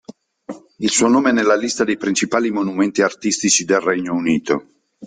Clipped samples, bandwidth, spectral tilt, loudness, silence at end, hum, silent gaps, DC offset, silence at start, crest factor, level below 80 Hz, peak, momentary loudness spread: under 0.1%; 9.6 kHz; -3 dB/octave; -17 LUFS; 0 s; none; none; under 0.1%; 0.1 s; 16 dB; -60 dBFS; -2 dBFS; 9 LU